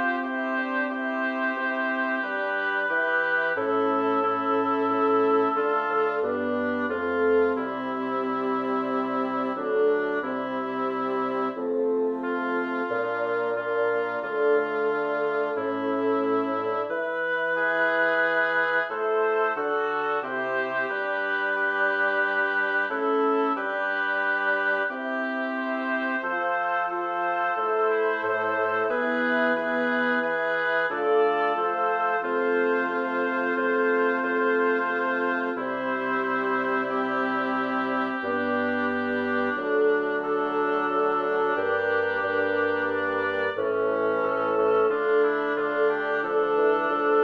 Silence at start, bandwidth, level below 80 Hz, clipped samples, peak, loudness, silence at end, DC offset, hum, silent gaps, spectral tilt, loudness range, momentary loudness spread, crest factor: 0 s; 6 kHz; -72 dBFS; under 0.1%; -12 dBFS; -25 LUFS; 0 s; under 0.1%; none; none; -6.5 dB/octave; 2 LU; 5 LU; 14 dB